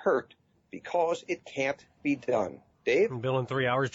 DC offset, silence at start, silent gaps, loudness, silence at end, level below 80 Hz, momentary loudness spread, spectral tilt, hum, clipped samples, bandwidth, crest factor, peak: under 0.1%; 0 s; none; -30 LUFS; 0.05 s; -70 dBFS; 9 LU; -6 dB/octave; none; under 0.1%; 8 kHz; 14 dB; -16 dBFS